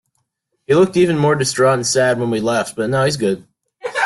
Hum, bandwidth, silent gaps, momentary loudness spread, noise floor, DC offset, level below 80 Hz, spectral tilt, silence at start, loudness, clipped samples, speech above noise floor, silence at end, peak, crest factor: none; 12.5 kHz; none; 7 LU; -70 dBFS; under 0.1%; -54 dBFS; -4.5 dB/octave; 0.7 s; -16 LUFS; under 0.1%; 55 dB; 0 s; -4 dBFS; 14 dB